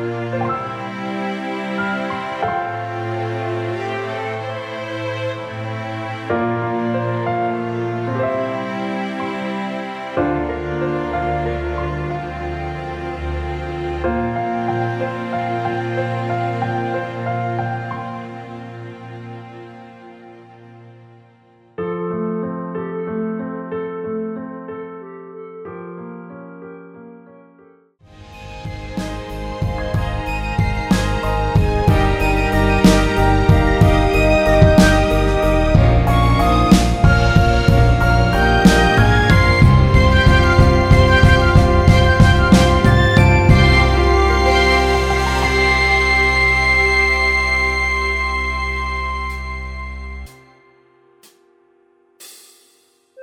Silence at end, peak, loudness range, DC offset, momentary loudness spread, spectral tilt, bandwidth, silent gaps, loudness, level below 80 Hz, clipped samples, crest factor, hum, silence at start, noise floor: 0 s; 0 dBFS; 18 LU; under 0.1%; 18 LU; -6 dB/octave; 15 kHz; none; -17 LUFS; -24 dBFS; under 0.1%; 16 dB; none; 0 s; -57 dBFS